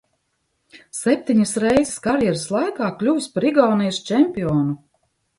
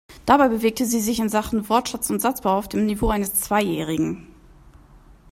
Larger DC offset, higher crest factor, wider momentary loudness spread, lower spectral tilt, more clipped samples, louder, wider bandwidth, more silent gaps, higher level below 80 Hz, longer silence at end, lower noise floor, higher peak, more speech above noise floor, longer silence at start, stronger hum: neither; about the same, 18 dB vs 20 dB; about the same, 6 LU vs 7 LU; about the same, -5.5 dB/octave vs -4.5 dB/octave; neither; about the same, -20 LUFS vs -21 LUFS; second, 11.5 kHz vs 16 kHz; neither; second, -52 dBFS vs -40 dBFS; second, 0.65 s vs 1.1 s; first, -71 dBFS vs -49 dBFS; about the same, -2 dBFS vs -2 dBFS; first, 52 dB vs 28 dB; first, 0.75 s vs 0.1 s; neither